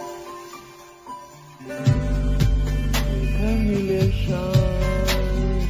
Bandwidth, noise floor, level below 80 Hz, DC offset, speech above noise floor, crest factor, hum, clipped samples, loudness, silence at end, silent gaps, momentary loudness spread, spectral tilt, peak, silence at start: 16 kHz; -44 dBFS; -26 dBFS; under 0.1%; 23 dB; 16 dB; none; under 0.1%; -22 LUFS; 0 s; none; 19 LU; -6.5 dB/octave; -6 dBFS; 0 s